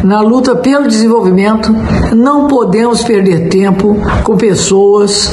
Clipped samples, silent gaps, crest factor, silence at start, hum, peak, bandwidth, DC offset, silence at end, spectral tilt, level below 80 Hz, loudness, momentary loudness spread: under 0.1%; none; 8 dB; 0 s; none; 0 dBFS; 11.5 kHz; under 0.1%; 0 s; -5.5 dB/octave; -26 dBFS; -8 LUFS; 3 LU